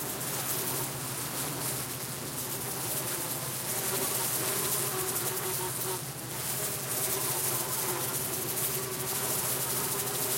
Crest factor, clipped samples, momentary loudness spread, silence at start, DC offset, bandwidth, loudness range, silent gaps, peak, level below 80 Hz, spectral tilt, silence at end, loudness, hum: 18 dB; under 0.1%; 5 LU; 0 s; under 0.1%; 17 kHz; 3 LU; none; -14 dBFS; -64 dBFS; -2 dB/octave; 0 s; -30 LUFS; none